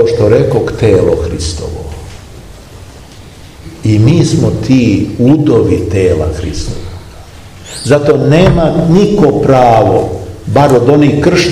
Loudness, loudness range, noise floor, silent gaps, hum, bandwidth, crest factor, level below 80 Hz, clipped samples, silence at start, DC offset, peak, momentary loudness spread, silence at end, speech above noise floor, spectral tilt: -9 LUFS; 7 LU; -32 dBFS; none; none; 13.5 kHz; 10 dB; -28 dBFS; 2%; 0 s; 0.5%; 0 dBFS; 15 LU; 0 s; 24 dB; -7 dB/octave